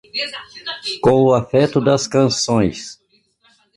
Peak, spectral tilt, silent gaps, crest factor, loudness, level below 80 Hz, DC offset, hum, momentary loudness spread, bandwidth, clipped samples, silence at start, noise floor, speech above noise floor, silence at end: -2 dBFS; -5 dB/octave; none; 16 dB; -17 LUFS; -48 dBFS; under 0.1%; none; 15 LU; 11.5 kHz; under 0.1%; 0.15 s; -58 dBFS; 42 dB; 0.85 s